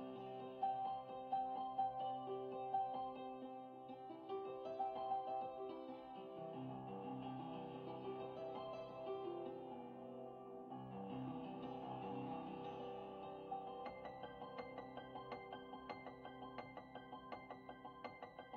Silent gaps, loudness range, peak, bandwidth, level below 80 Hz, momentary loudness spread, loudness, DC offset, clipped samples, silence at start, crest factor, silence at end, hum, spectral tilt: none; 8 LU; -32 dBFS; 6.2 kHz; -80 dBFS; 11 LU; -49 LUFS; under 0.1%; under 0.1%; 0 s; 18 dB; 0 s; none; -5 dB/octave